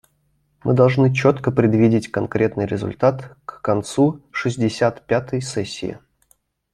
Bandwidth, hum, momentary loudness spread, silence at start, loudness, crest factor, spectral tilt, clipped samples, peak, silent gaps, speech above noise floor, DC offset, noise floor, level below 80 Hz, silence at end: 11.5 kHz; none; 12 LU; 0.65 s; -19 LUFS; 18 dB; -7 dB/octave; under 0.1%; -2 dBFS; none; 46 dB; under 0.1%; -65 dBFS; -54 dBFS; 0.75 s